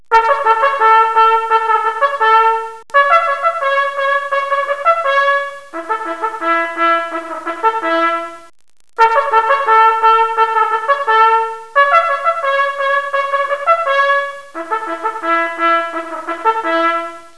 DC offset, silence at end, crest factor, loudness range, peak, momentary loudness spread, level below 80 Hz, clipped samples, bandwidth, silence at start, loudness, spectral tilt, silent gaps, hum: 0.8%; 0.1 s; 14 dB; 4 LU; 0 dBFS; 10 LU; -58 dBFS; under 0.1%; 11 kHz; 0.1 s; -14 LUFS; -2 dB/octave; none; none